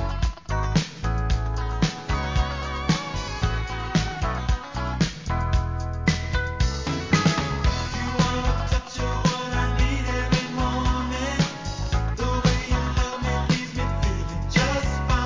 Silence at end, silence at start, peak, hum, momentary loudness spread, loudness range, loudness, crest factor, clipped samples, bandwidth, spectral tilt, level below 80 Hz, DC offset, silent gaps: 0 s; 0 s; -6 dBFS; none; 5 LU; 2 LU; -25 LUFS; 18 dB; under 0.1%; 7.6 kHz; -5 dB/octave; -28 dBFS; 0.2%; none